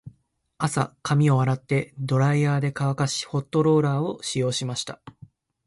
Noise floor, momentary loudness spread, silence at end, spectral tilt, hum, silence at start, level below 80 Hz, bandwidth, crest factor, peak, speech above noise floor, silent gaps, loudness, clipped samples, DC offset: -64 dBFS; 8 LU; 0.55 s; -6 dB/octave; none; 0.05 s; -60 dBFS; 11.5 kHz; 16 dB; -8 dBFS; 41 dB; none; -24 LUFS; under 0.1%; under 0.1%